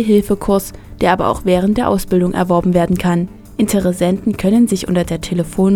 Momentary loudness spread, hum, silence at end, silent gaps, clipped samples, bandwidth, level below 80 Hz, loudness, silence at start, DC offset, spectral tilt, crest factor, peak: 6 LU; none; 0 s; none; under 0.1%; 17.5 kHz; -34 dBFS; -15 LUFS; 0 s; under 0.1%; -6.5 dB/octave; 14 dB; 0 dBFS